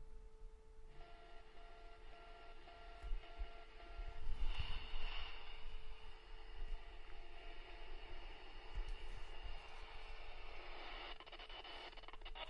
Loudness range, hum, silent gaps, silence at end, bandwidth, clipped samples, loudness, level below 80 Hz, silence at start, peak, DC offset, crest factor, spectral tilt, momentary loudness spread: 6 LU; none; none; 0 s; 5.8 kHz; under 0.1%; -55 LUFS; -50 dBFS; 0 s; -28 dBFS; under 0.1%; 18 dB; -4.5 dB/octave; 13 LU